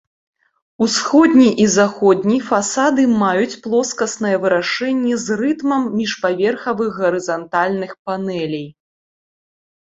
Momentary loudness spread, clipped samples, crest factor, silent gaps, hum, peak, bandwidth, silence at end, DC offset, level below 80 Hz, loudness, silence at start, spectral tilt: 10 LU; under 0.1%; 16 dB; 7.99-8.05 s; none; -2 dBFS; 8 kHz; 1.1 s; under 0.1%; -60 dBFS; -17 LUFS; 0.8 s; -4.5 dB/octave